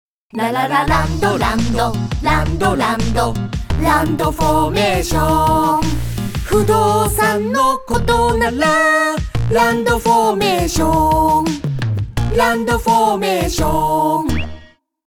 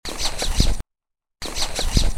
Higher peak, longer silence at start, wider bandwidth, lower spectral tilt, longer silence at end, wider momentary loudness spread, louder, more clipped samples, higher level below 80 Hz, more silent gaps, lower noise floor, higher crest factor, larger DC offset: about the same, -2 dBFS vs 0 dBFS; about the same, 0.05 s vs 0.05 s; first, 19.5 kHz vs 16 kHz; first, -5 dB/octave vs -3 dB/octave; about the same, 0 s vs 0 s; second, 7 LU vs 12 LU; first, -16 LUFS vs -24 LUFS; neither; about the same, -28 dBFS vs -24 dBFS; neither; second, -43 dBFS vs -82 dBFS; second, 14 dB vs 20 dB; first, 2% vs under 0.1%